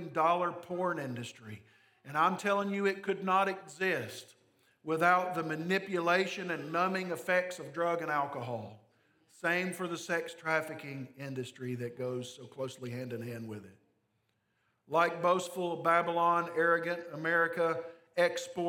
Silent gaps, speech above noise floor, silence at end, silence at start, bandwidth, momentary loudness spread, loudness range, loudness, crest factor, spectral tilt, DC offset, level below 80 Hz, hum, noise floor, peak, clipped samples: none; 45 dB; 0 s; 0 s; 18 kHz; 13 LU; 8 LU; -32 LUFS; 20 dB; -5 dB/octave; under 0.1%; -88 dBFS; none; -78 dBFS; -14 dBFS; under 0.1%